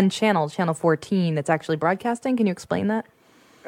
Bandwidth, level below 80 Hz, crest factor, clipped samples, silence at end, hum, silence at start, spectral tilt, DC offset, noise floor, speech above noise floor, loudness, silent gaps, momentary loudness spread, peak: 13.5 kHz; -68 dBFS; 18 dB; under 0.1%; 0 s; none; 0 s; -6.5 dB/octave; under 0.1%; -55 dBFS; 33 dB; -23 LUFS; none; 4 LU; -6 dBFS